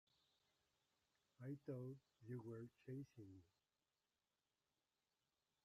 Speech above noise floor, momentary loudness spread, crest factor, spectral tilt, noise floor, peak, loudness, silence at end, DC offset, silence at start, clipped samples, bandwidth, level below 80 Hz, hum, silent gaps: over 34 dB; 10 LU; 18 dB; -9 dB/octave; under -90 dBFS; -40 dBFS; -57 LUFS; 2.2 s; under 0.1%; 1.4 s; under 0.1%; 13 kHz; under -90 dBFS; none; none